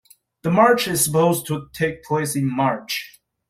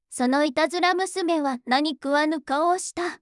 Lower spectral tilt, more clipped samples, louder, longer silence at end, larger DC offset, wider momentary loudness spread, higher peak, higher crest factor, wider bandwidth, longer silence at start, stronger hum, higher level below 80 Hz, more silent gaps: first, -4.5 dB/octave vs -2 dB/octave; neither; first, -20 LUFS vs -23 LUFS; first, 0.4 s vs 0.05 s; neither; first, 12 LU vs 3 LU; first, -2 dBFS vs -8 dBFS; about the same, 18 dB vs 14 dB; first, 16 kHz vs 12 kHz; first, 0.45 s vs 0.1 s; neither; first, -56 dBFS vs -70 dBFS; neither